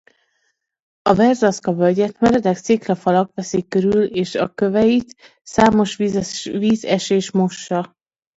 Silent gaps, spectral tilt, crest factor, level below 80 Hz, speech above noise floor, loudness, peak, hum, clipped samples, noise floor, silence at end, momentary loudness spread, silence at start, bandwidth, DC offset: none; -6 dB/octave; 18 dB; -50 dBFS; 52 dB; -18 LUFS; 0 dBFS; none; under 0.1%; -69 dBFS; 0.5 s; 8 LU; 1.05 s; 8 kHz; under 0.1%